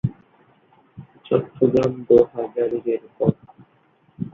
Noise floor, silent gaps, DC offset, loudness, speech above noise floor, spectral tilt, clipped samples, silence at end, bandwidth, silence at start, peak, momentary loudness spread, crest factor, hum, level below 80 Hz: -59 dBFS; none; under 0.1%; -21 LUFS; 40 dB; -9.5 dB/octave; under 0.1%; 0.05 s; 7 kHz; 0.05 s; -2 dBFS; 11 LU; 20 dB; none; -54 dBFS